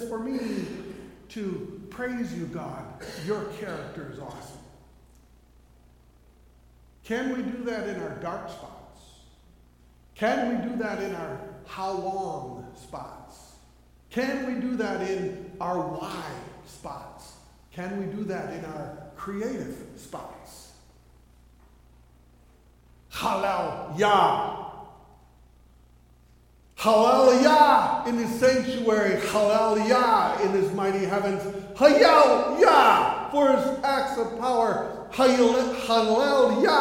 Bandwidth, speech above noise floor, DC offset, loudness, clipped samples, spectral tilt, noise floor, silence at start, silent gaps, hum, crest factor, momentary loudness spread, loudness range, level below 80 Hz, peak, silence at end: 16.5 kHz; 32 dB; under 0.1%; -24 LUFS; under 0.1%; -4.5 dB/octave; -56 dBFS; 0 s; none; 60 Hz at -55 dBFS; 22 dB; 23 LU; 17 LU; -56 dBFS; -4 dBFS; 0 s